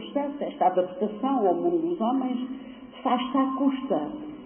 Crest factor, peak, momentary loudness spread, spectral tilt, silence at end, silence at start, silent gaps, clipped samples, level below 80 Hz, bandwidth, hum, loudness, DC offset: 16 dB; -10 dBFS; 8 LU; -10.5 dB/octave; 0 s; 0 s; none; under 0.1%; -66 dBFS; 3.5 kHz; none; -26 LUFS; under 0.1%